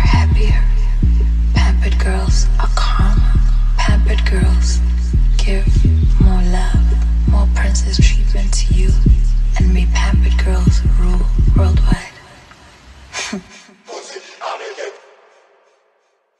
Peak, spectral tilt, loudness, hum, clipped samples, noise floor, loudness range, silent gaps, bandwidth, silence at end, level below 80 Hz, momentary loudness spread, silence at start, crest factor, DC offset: -2 dBFS; -5.5 dB/octave; -16 LUFS; none; under 0.1%; -61 dBFS; 13 LU; none; 9.6 kHz; 1.45 s; -14 dBFS; 12 LU; 0 s; 12 dB; under 0.1%